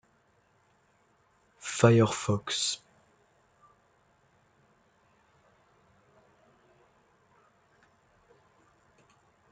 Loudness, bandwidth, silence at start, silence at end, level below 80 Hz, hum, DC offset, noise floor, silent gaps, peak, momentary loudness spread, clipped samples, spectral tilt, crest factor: -27 LUFS; 9.4 kHz; 1.65 s; 6.75 s; -70 dBFS; none; under 0.1%; -68 dBFS; none; -8 dBFS; 17 LU; under 0.1%; -5 dB/octave; 26 dB